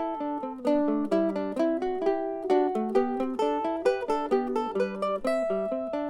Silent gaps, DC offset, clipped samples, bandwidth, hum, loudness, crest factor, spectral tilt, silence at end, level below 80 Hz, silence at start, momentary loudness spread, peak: none; under 0.1%; under 0.1%; 11.5 kHz; none; -28 LUFS; 16 dB; -6.5 dB/octave; 0 s; -58 dBFS; 0 s; 4 LU; -12 dBFS